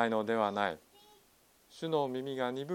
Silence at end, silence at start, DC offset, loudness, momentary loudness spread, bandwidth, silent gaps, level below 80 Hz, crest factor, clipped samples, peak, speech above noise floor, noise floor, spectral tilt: 0 s; 0 s; under 0.1%; -34 LUFS; 8 LU; 17 kHz; none; -78 dBFS; 22 dB; under 0.1%; -14 dBFS; 33 dB; -66 dBFS; -6 dB/octave